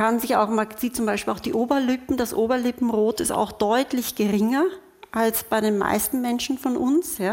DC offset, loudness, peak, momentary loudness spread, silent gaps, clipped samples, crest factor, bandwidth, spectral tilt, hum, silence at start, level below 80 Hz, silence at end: under 0.1%; -23 LUFS; -6 dBFS; 4 LU; none; under 0.1%; 16 dB; 17 kHz; -4 dB/octave; none; 0 s; -54 dBFS; 0 s